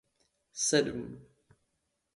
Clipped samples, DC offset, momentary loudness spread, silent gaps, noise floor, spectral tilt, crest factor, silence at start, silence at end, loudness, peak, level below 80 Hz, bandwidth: under 0.1%; under 0.1%; 20 LU; none; -80 dBFS; -3 dB/octave; 24 dB; 0.55 s; 0.95 s; -30 LUFS; -12 dBFS; -66 dBFS; 11.5 kHz